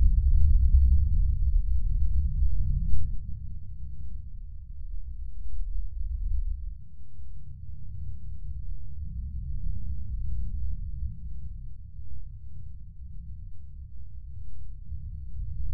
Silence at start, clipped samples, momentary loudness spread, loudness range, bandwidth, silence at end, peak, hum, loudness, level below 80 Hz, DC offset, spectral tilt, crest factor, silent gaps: 0 s; under 0.1%; 21 LU; 16 LU; 0.5 kHz; 0 s; -8 dBFS; none; -32 LUFS; -28 dBFS; under 0.1%; -11 dB/octave; 18 dB; none